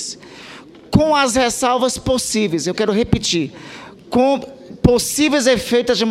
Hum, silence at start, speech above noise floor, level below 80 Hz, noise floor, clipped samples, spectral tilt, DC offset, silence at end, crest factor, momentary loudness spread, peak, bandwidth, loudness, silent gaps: none; 0 s; 22 dB; -38 dBFS; -39 dBFS; under 0.1%; -4 dB/octave; under 0.1%; 0 s; 16 dB; 20 LU; 0 dBFS; 16 kHz; -17 LUFS; none